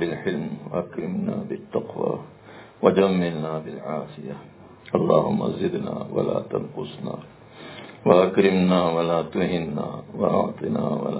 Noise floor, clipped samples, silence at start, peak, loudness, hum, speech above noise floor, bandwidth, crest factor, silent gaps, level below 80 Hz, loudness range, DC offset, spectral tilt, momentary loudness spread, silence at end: -45 dBFS; under 0.1%; 0 s; -2 dBFS; -24 LUFS; none; 22 dB; 4 kHz; 22 dB; none; -56 dBFS; 4 LU; under 0.1%; -11.5 dB/octave; 15 LU; 0 s